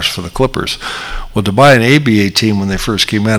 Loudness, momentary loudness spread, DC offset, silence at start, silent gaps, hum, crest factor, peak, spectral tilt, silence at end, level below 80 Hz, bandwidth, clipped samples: -12 LUFS; 12 LU; under 0.1%; 0 s; none; none; 12 dB; 0 dBFS; -5 dB/octave; 0 s; -30 dBFS; over 20 kHz; 0.4%